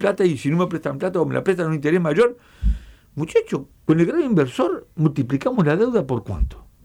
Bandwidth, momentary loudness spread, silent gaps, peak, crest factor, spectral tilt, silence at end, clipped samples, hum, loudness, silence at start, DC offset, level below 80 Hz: 12 kHz; 9 LU; none; -6 dBFS; 14 dB; -7.5 dB/octave; 0.25 s; under 0.1%; none; -21 LUFS; 0 s; under 0.1%; -32 dBFS